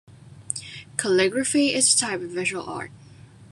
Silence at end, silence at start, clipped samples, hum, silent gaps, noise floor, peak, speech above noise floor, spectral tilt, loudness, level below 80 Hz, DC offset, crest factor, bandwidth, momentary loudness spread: 0.05 s; 0.1 s; under 0.1%; none; none; -47 dBFS; -4 dBFS; 24 dB; -2 dB/octave; -22 LUFS; -66 dBFS; under 0.1%; 22 dB; 13 kHz; 15 LU